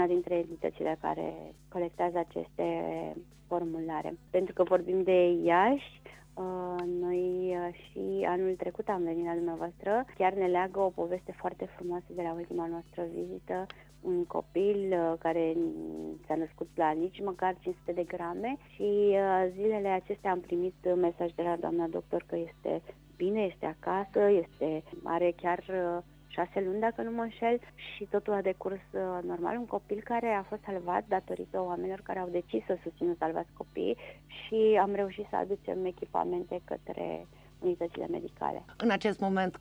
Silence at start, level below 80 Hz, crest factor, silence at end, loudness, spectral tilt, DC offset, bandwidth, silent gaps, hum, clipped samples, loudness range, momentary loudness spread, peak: 0 s; -62 dBFS; 18 dB; 0 s; -32 LUFS; -7.5 dB/octave; under 0.1%; 9.4 kHz; none; none; under 0.1%; 6 LU; 11 LU; -14 dBFS